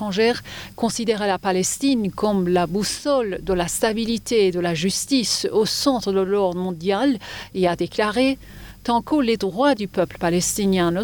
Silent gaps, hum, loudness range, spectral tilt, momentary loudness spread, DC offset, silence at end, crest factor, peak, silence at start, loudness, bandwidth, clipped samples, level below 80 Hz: none; none; 2 LU; -4 dB/octave; 5 LU; under 0.1%; 0 s; 14 dB; -6 dBFS; 0 s; -21 LUFS; over 20 kHz; under 0.1%; -46 dBFS